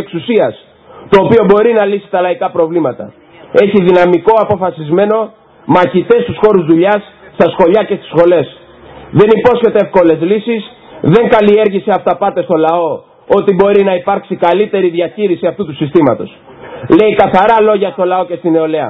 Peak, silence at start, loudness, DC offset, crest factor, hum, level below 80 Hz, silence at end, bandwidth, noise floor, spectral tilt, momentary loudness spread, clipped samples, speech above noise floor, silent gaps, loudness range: 0 dBFS; 0 s; -10 LUFS; under 0.1%; 10 dB; none; -46 dBFS; 0 s; 6 kHz; -34 dBFS; -9 dB/octave; 9 LU; 0.6%; 25 dB; none; 2 LU